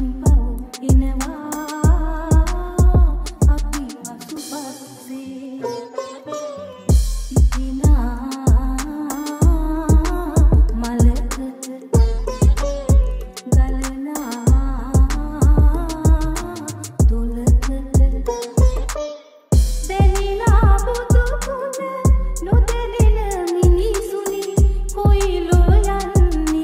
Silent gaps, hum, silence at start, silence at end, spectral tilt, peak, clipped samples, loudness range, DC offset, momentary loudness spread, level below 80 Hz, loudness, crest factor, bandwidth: none; none; 0 s; 0 s; -6.5 dB/octave; -2 dBFS; under 0.1%; 3 LU; under 0.1%; 13 LU; -18 dBFS; -19 LUFS; 14 dB; 16 kHz